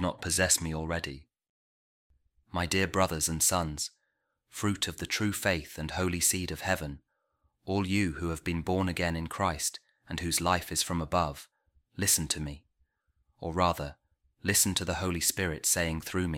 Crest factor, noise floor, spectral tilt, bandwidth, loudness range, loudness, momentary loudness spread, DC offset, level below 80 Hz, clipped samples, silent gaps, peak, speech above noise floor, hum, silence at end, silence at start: 22 dB; -80 dBFS; -3 dB/octave; 16.5 kHz; 2 LU; -29 LUFS; 14 LU; under 0.1%; -50 dBFS; under 0.1%; 1.49-2.10 s; -10 dBFS; 49 dB; none; 0 s; 0 s